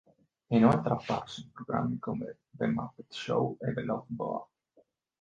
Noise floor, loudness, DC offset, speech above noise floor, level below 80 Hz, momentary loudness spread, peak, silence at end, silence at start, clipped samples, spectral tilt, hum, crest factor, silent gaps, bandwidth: -68 dBFS; -32 LUFS; under 0.1%; 37 dB; -62 dBFS; 15 LU; -8 dBFS; 0.75 s; 0.5 s; under 0.1%; -7.5 dB/octave; none; 24 dB; none; 7.6 kHz